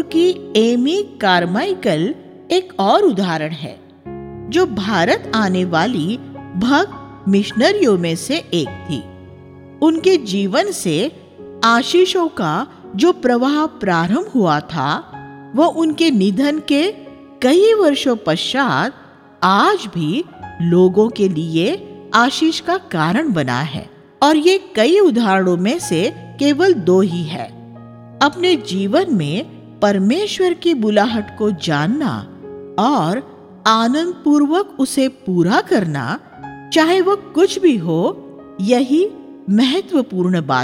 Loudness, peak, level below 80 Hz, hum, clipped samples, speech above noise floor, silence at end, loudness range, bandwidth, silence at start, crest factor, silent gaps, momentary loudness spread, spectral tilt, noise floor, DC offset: -16 LUFS; 0 dBFS; -56 dBFS; none; under 0.1%; 23 dB; 0 s; 3 LU; 15.5 kHz; 0 s; 16 dB; none; 11 LU; -5.5 dB/octave; -38 dBFS; under 0.1%